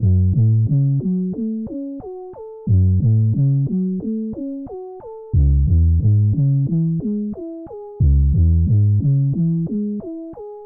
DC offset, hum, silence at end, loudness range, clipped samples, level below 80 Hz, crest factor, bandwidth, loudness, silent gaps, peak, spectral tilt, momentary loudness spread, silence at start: under 0.1%; none; 0 s; 2 LU; under 0.1%; -26 dBFS; 10 dB; 1.1 kHz; -18 LUFS; none; -6 dBFS; -17 dB/octave; 16 LU; 0 s